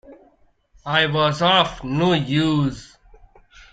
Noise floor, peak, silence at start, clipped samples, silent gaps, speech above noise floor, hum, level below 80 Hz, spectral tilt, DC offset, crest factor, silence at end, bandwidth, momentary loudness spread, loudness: -58 dBFS; -2 dBFS; 0.1 s; under 0.1%; none; 39 dB; none; -48 dBFS; -6 dB/octave; under 0.1%; 18 dB; 0.9 s; 9.2 kHz; 9 LU; -19 LUFS